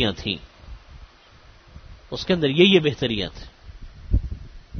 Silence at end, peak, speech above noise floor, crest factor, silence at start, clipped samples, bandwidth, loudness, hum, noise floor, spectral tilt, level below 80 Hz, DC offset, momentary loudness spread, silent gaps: 0 s; -4 dBFS; 29 dB; 20 dB; 0 s; under 0.1%; 6.6 kHz; -21 LUFS; none; -50 dBFS; -6 dB/octave; -34 dBFS; under 0.1%; 22 LU; none